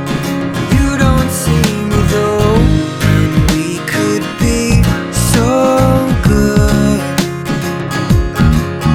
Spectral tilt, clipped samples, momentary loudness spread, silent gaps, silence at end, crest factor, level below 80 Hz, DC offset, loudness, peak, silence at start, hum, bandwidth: -6 dB/octave; under 0.1%; 6 LU; none; 0 s; 12 dB; -20 dBFS; under 0.1%; -12 LUFS; 0 dBFS; 0 s; none; 17.5 kHz